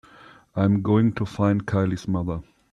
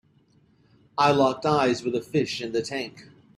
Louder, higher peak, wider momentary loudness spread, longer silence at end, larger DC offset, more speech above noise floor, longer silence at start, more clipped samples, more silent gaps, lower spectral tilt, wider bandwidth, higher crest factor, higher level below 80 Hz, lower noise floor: about the same, -23 LUFS vs -24 LUFS; about the same, -8 dBFS vs -6 dBFS; about the same, 11 LU vs 12 LU; about the same, 0.3 s vs 0.35 s; neither; second, 28 dB vs 37 dB; second, 0.55 s vs 0.95 s; neither; neither; first, -8.5 dB/octave vs -5.5 dB/octave; second, 9.6 kHz vs 13.5 kHz; about the same, 16 dB vs 20 dB; first, -50 dBFS vs -64 dBFS; second, -50 dBFS vs -61 dBFS